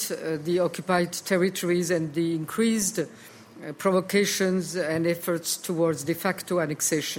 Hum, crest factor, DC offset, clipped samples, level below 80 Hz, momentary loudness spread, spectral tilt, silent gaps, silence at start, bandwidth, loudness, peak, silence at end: none; 16 dB; under 0.1%; under 0.1%; -68 dBFS; 5 LU; -4 dB/octave; none; 0 s; 17 kHz; -26 LUFS; -10 dBFS; 0 s